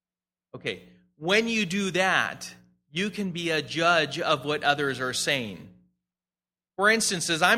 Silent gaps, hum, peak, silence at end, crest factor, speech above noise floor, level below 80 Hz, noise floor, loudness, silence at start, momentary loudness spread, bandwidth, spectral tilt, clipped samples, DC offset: none; none; -6 dBFS; 0 s; 22 dB; over 64 dB; -66 dBFS; under -90 dBFS; -25 LUFS; 0.55 s; 14 LU; 16 kHz; -3 dB/octave; under 0.1%; under 0.1%